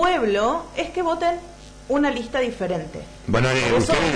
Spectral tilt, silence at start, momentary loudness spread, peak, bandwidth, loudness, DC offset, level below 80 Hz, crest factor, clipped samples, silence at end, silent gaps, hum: -5 dB/octave; 0 s; 14 LU; -8 dBFS; 10.5 kHz; -22 LUFS; under 0.1%; -40 dBFS; 14 dB; under 0.1%; 0 s; none; 50 Hz at -45 dBFS